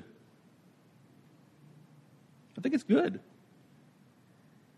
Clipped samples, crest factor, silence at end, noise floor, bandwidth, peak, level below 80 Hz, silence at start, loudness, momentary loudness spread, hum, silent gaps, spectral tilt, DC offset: under 0.1%; 22 dB; 1.55 s; -62 dBFS; 11.5 kHz; -14 dBFS; -84 dBFS; 2.55 s; -31 LUFS; 22 LU; none; none; -7 dB/octave; under 0.1%